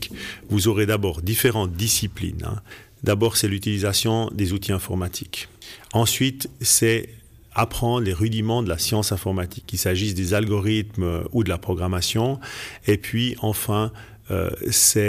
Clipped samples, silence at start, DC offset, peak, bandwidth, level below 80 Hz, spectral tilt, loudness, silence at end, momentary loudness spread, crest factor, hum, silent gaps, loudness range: under 0.1%; 0 s; under 0.1%; -4 dBFS; 15.5 kHz; -42 dBFS; -4 dB/octave; -22 LUFS; 0 s; 10 LU; 18 dB; none; none; 2 LU